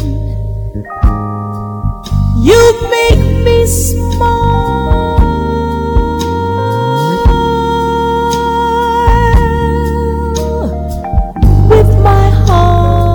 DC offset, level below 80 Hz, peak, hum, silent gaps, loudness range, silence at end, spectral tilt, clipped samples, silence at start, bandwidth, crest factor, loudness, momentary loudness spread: under 0.1%; -14 dBFS; 0 dBFS; none; none; 3 LU; 0 s; -6.5 dB/octave; under 0.1%; 0 s; 17.5 kHz; 10 dB; -11 LUFS; 11 LU